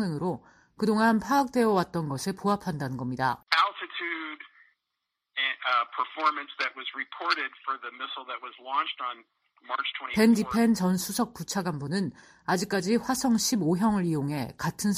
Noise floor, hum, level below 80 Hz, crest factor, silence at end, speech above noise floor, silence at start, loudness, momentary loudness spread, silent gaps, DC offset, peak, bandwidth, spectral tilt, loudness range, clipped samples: -84 dBFS; none; -62 dBFS; 18 dB; 0 s; 56 dB; 0 s; -28 LUFS; 11 LU; none; under 0.1%; -10 dBFS; 15.5 kHz; -4.5 dB/octave; 4 LU; under 0.1%